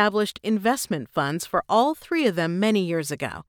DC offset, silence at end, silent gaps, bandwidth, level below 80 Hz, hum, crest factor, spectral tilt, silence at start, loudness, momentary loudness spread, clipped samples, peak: under 0.1%; 0.05 s; none; 19.5 kHz; -60 dBFS; none; 18 dB; -5 dB/octave; 0 s; -24 LUFS; 5 LU; under 0.1%; -6 dBFS